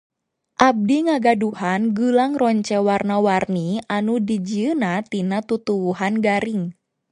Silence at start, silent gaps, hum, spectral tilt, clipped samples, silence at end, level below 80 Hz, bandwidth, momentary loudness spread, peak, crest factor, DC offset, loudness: 0.6 s; none; none; -6.5 dB/octave; under 0.1%; 0.4 s; -60 dBFS; 10.5 kHz; 6 LU; 0 dBFS; 20 dB; under 0.1%; -20 LUFS